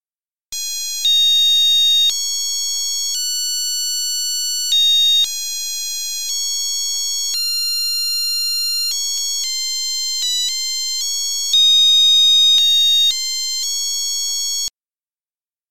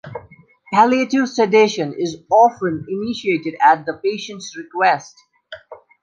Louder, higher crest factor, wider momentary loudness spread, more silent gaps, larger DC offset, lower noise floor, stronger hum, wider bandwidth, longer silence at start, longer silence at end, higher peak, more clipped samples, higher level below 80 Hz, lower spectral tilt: first, -14 LUFS vs -17 LUFS; about the same, 12 dB vs 16 dB; second, 11 LU vs 16 LU; first, 15.21-15.26 s vs none; first, 2% vs under 0.1%; first, under -90 dBFS vs -47 dBFS; neither; first, 17 kHz vs 9 kHz; about the same, 0 s vs 0.05 s; second, 0 s vs 0.3 s; second, -6 dBFS vs -2 dBFS; neither; second, -66 dBFS vs -60 dBFS; second, 5.5 dB/octave vs -5 dB/octave